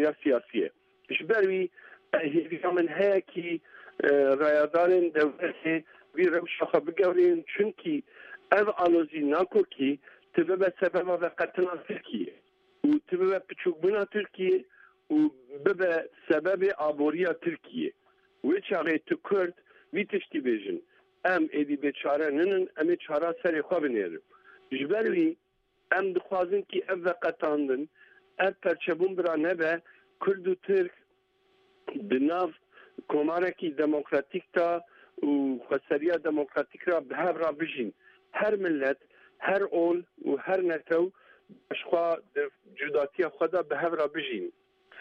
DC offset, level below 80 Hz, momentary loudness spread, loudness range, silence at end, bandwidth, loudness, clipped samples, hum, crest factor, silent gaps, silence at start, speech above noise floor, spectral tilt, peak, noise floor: under 0.1%; -76 dBFS; 10 LU; 4 LU; 0 s; 5.8 kHz; -29 LUFS; under 0.1%; none; 22 dB; none; 0 s; 42 dB; -7.5 dB/octave; -6 dBFS; -69 dBFS